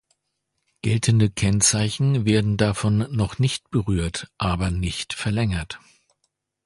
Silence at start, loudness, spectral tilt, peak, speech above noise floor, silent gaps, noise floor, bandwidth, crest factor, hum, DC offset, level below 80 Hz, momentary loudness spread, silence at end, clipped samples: 0.85 s; -22 LUFS; -5 dB/octave; -4 dBFS; 55 dB; none; -77 dBFS; 11.5 kHz; 18 dB; none; under 0.1%; -38 dBFS; 9 LU; 0.9 s; under 0.1%